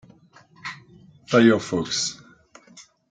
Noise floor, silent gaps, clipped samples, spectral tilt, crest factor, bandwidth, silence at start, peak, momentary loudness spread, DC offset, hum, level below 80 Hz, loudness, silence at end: -53 dBFS; none; under 0.1%; -4 dB/octave; 20 dB; 9.4 kHz; 0.65 s; -4 dBFS; 23 LU; under 0.1%; none; -64 dBFS; -21 LUFS; 0.3 s